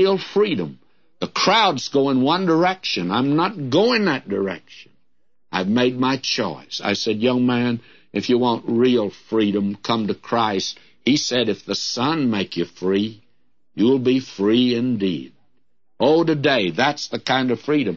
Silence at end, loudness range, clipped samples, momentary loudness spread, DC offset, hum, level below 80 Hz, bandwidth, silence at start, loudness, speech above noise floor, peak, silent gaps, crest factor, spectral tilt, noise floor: 0 s; 3 LU; under 0.1%; 9 LU; 0.2%; none; -64 dBFS; 7.4 kHz; 0 s; -20 LUFS; 55 dB; -4 dBFS; none; 16 dB; -5 dB/octave; -74 dBFS